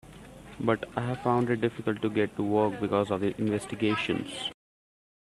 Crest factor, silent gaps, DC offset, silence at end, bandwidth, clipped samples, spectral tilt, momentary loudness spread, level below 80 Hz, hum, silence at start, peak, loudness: 20 dB; none; under 0.1%; 0.85 s; 13 kHz; under 0.1%; -6.5 dB/octave; 9 LU; -60 dBFS; none; 0.05 s; -10 dBFS; -29 LUFS